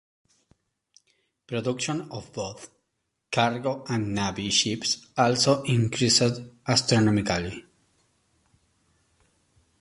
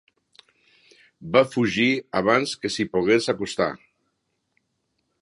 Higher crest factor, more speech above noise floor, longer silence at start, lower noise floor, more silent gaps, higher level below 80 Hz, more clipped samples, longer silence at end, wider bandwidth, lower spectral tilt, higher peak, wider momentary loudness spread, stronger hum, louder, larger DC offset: about the same, 22 dB vs 22 dB; about the same, 54 dB vs 53 dB; first, 1.5 s vs 1.2 s; first, -79 dBFS vs -75 dBFS; neither; first, -54 dBFS vs -60 dBFS; neither; first, 2.2 s vs 1.45 s; about the same, 11.5 kHz vs 11.5 kHz; about the same, -4 dB/octave vs -4.5 dB/octave; second, -6 dBFS vs -2 dBFS; first, 14 LU vs 7 LU; neither; second, -25 LUFS vs -22 LUFS; neither